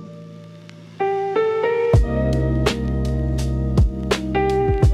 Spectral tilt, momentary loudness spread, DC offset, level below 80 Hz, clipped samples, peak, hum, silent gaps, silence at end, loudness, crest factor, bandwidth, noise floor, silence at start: -7 dB/octave; 21 LU; under 0.1%; -26 dBFS; under 0.1%; -6 dBFS; none; none; 0 s; -20 LUFS; 14 dB; 13 kHz; -40 dBFS; 0 s